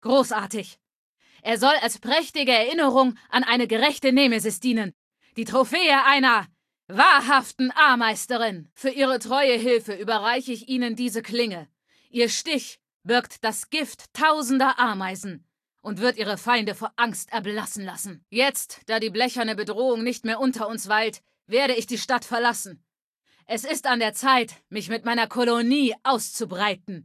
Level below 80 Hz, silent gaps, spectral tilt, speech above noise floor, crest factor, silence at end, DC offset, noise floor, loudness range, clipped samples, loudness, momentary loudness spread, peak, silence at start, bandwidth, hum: -74 dBFS; 0.95-1.17 s, 4.94-5.11 s, 8.72-8.76 s, 12.94-13.00 s, 23.02-23.13 s; -2.5 dB/octave; 47 dB; 22 dB; 0 s; under 0.1%; -70 dBFS; 6 LU; under 0.1%; -22 LUFS; 13 LU; -2 dBFS; 0.05 s; 14.5 kHz; none